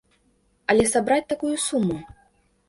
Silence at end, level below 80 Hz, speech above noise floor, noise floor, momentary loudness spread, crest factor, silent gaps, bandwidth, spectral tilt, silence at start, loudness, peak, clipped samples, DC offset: 0.65 s; -52 dBFS; 43 dB; -65 dBFS; 10 LU; 18 dB; none; 11.5 kHz; -4 dB/octave; 0.7 s; -22 LUFS; -6 dBFS; under 0.1%; under 0.1%